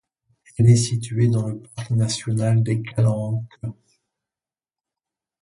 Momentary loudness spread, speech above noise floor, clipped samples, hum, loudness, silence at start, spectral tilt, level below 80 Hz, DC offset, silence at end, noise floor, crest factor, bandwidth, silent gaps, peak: 17 LU; over 70 dB; under 0.1%; none; -21 LUFS; 0.6 s; -6.5 dB/octave; -52 dBFS; under 0.1%; 1.7 s; under -90 dBFS; 18 dB; 11.5 kHz; none; -4 dBFS